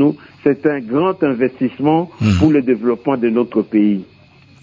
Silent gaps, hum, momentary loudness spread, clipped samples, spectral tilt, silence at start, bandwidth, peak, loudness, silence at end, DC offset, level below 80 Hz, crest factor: none; none; 5 LU; under 0.1%; -8.5 dB/octave; 0 s; 7.6 kHz; -2 dBFS; -16 LUFS; 0.6 s; under 0.1%; -38 dBFS; 14 dB